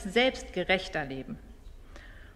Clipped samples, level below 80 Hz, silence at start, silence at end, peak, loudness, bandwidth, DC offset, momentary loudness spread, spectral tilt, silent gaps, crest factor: under 0.1%; -48 dBFS; 0 s; 0 s; -12 dBFS; -30 LUFS; 14 kHz; under 0.1%; 24 LU; -4 dB/octave; none; 20 dB